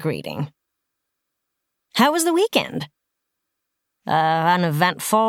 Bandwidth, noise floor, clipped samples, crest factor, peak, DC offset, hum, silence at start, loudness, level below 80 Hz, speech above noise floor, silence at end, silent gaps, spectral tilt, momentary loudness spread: 19 kHz; -79 dBFS; under 0.1%; 18 dB; -4 dBFS; under 0.1%; none; 0 s; -20 LUFS; -68 dBFS; 60 dB; 0 s; none; -4.5 dB/octave; 14 LU